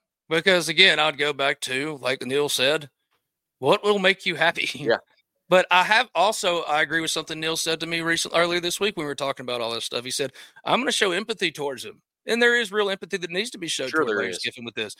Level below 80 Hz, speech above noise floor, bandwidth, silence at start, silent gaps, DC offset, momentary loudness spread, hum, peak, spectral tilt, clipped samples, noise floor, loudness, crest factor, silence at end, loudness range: -68 dBFS; 52 dB; 16.5 kHz; 0.3 s; none; under 0.1%; 10 LU; none; 0 dBFS; -2.5 dB/octave; under 0.1%; -75 dBFS; -22 LUFS; 24 dB; 0.05 s; 4 LU